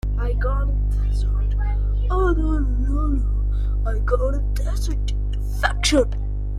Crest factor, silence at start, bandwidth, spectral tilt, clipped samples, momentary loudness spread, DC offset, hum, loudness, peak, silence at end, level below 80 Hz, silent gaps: 16 dB; 0.05 s; 11.5 kHz; -5.5 dB/octave; under 0.1%; 5 LU; under 0.1%; 50 Hz at -20 dBFS; -23 LUFS; -4 dBFS; 0 s; -20 dBFS; none